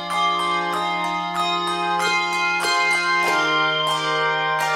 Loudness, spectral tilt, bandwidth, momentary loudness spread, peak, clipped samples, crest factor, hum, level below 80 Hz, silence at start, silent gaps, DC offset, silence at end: -20 LUFS; -2.5 dB/octave; 16.5 kHz; 5 LU; -8 dBFS; under 0.1%; 14 dB; none; -60 dBFS; 0 s; none; under 0.1%; 0 s